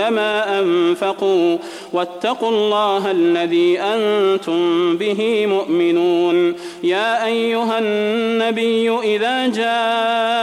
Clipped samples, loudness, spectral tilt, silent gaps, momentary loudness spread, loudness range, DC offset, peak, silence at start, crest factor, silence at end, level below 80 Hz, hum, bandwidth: under 0.1%; -17 LUFS; -5 dB/octave; none; 4 LU; 1 LU; under 0.1%; -6 dBFS; 0 s; 12 dB; 0 s; -66 dBFS; none; 12.5 kHz